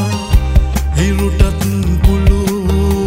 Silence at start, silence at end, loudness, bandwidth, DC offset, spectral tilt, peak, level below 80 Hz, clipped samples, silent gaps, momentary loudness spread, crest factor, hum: 0 s; 0 s; -14 LUFS; 16.5 kHz; under 0.1%; -6.5 dB/octave; 0 dBFS; -14 dBFS; under 0.1%; none; 3 LU; 12 dB; none